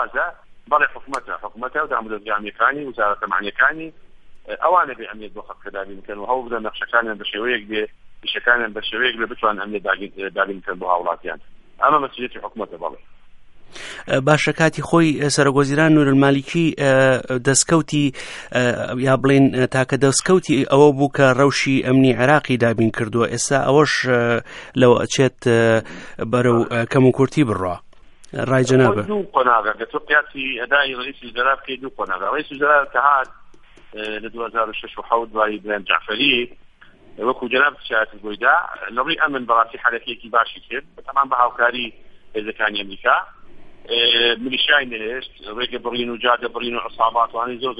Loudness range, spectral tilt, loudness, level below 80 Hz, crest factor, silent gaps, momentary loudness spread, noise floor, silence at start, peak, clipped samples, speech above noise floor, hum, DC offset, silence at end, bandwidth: 6 LU; -4.5 dB/octave; -18 LUFS; -50 dBFS; 18 dB; none; 14 LU; -46 dBFS; 0 s; 0 dBFS; under 0.1%; 27 dB; none; under 0.1%; 0 s; 11.5 kHz